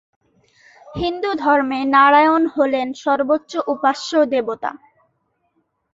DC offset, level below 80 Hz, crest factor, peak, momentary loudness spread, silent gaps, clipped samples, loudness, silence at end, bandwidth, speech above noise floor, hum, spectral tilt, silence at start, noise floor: under 0.1%; -52 dBFS; 18 dB; -2 dBFS; 13 LU; none; under 0.1%; -17 LUFS; 1.2 s; 8 kHz; 51 dB; none; -4.5 dB/octave; 0.85 s; -68 dBFS